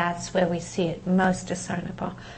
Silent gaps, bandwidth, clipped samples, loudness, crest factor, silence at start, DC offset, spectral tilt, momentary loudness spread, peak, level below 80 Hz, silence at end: none; 8.8 kHz; under 0.1%; -26 LUFS; 18 dB; 0 s; under 0.1%; -5.5 dB/octave; 9 LU; -10 dBFS; -50 dBFS; 0 s